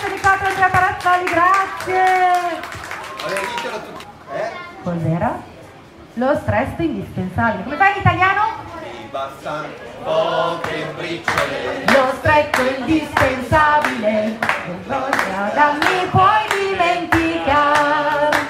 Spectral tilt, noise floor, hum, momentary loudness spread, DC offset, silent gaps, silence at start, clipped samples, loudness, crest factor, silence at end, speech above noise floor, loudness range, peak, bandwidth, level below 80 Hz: -5 dB/octave; -41 dBFS; none; 13 LU; under 0.1%; none; 0 s; under 0.1%; -17 LUFS; 18 dB; 0 s; 23 dB; 7 LU; 0 dBFS; 16 kHz; -44 dBFS